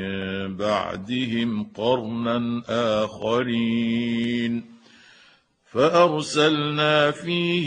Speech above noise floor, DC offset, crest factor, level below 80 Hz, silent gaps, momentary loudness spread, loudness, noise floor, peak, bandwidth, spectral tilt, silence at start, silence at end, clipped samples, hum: 35 dB; under 0.1%; 18 dB; -62 dBFS; none; 8 LU; -23 LUFS; -57 dBFS; -4 dBFS; 10 kHz; -5.5 dB/octave; 0 s; 0 s; under 0.1%; none